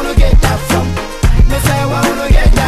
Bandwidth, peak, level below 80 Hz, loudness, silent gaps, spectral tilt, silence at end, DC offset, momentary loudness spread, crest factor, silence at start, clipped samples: 14.5 kHz; 0 dBFS; -12 dBFS; -13 LUFS; none; -5.5 dB/octave; 0 s; under 0.1%; 4 LU; 10 dB; 0 s; under 0.1%